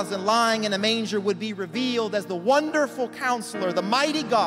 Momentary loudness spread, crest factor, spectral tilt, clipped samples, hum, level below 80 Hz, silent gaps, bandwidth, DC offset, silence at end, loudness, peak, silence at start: 6 LU; 16 dB; -3.5 dB/octave; under 0.1%; none; -70 dBFS; none; 16 kHz; under 0.1%; 0 s; -24 LUFS; -8 dBFS; 0 s